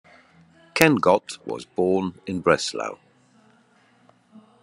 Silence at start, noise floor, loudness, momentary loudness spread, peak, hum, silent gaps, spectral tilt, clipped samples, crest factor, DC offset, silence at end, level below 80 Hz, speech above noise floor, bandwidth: 0.75 s; -59 dBFS; -22 LUFS; 15 LU; 0 dBFS; none; none; -4.5 dB/octave; under 0.1%; 24 dB; under 0.1%; 1.7 s; -62 dBFS; 37 dB; 11.5 kHz